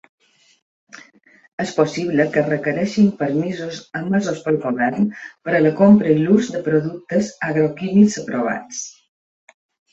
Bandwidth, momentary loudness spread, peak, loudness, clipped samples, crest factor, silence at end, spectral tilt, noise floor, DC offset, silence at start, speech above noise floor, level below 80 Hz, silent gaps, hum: 8 kHz; 13 LU; -2 dBFS; -18 LUFS; under 0.1%; 16 dB; 1.05 s; -6.5 dB/octave; -49 dBFS; under 0.1%; 0.95 s; 32 dB; -60 dBFS; 1.48-1.58 s; none